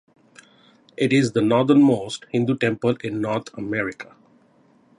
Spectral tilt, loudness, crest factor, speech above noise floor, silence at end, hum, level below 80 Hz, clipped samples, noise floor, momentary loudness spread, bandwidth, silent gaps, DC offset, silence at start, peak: -6.5 dB/octave; -21 LUFS; 18 dB; 37 dB; 0.95 s; none; -62 dBFS; under 0.1%; -57 dBFS; 11 LU; 11 kHz; none; under 0.1%; 1 s; -4 dBFS